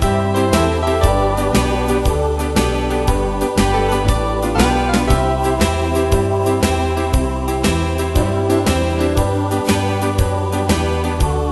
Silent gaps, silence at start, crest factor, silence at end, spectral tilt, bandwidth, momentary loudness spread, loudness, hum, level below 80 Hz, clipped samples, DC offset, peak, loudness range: none; 0 s; 16 dB; 0 s; -5.5 dB/octave; 12.5 kHz; 3 LU; -17 LUFS; none; -22 dBFS; under 0.1%; under 0.1%; 0 dBFS; 1 LU